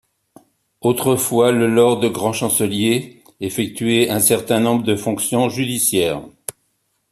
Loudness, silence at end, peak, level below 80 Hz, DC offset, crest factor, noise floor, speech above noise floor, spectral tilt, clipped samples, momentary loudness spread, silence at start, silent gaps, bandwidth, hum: -17 LUFS; 0.6 s; -2 dBFS; -56 dBFS; under 0.1%; 16 dB; -68 dBFS; 50 dB; -4 dB/octave; under 0.1%; 11 LU; 0.85 s; none; 14.5 kHz; none